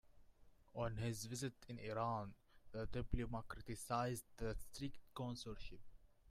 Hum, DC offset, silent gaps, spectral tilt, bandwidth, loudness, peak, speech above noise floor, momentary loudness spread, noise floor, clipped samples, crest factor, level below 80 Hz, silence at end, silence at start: none; under 0.1%; none; -5.5 dB/octave; 15.5 kHz; -47 LUFS; -24 dBFS; 21 dB; 12 LU; -67 dBFS; under 0.1%; 22 dB; -56 dBFS; 0 s; 0.05 s